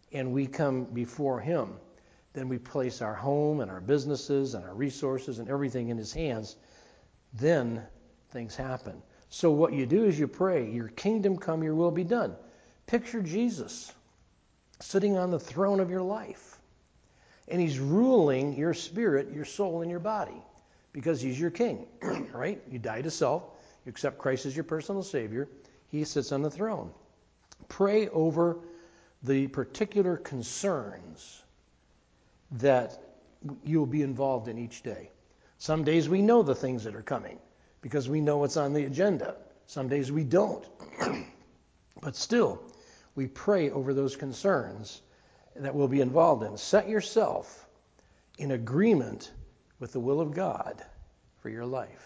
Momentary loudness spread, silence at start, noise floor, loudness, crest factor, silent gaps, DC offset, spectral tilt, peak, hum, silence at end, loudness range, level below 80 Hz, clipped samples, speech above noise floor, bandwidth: 17 LU; 0.1 s; -66 dBFS; -30 LUFS; 20 dB; none; under 0.1%; -6.5 dB/octave; -10 dBFS; none; 0.1 s; 5 LU; -62 dBFS; under 0.1%; 37 dB; 8 kHz